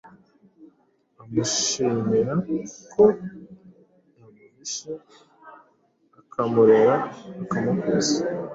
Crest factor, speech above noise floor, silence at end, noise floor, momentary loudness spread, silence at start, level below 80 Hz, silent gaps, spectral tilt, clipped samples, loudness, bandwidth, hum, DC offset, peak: 20 dB; 42 dB; 0 s; -64 dBFS; 17 LU; 0.6 s; -62 dBFS; none; -4.5 dB/octave; under 0.1%; -22 LUFS; 7.8 kHz; none; under 0.1%; -4 dBFS